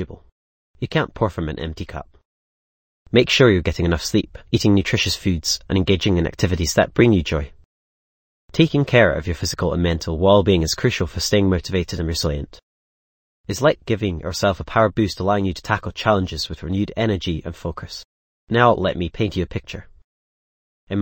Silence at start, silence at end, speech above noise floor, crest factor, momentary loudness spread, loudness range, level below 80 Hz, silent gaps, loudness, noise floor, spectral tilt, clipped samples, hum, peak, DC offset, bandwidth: 0 s; 0 s; over 71 dB; 20 dB; 14 LU; 5 LU; -36 dBFS; 0.32-0.74 s, 2.25-3.06 s, 7.65-8.48 s, 12.63-13.44 s, 18.05-18.47 s, 20.04-20.87 s; -20 LUFS; under -90 dBFS; -5.5 dB/octave; under 0.1%; none; 0 dBFS; under 0.1%; 17 kHz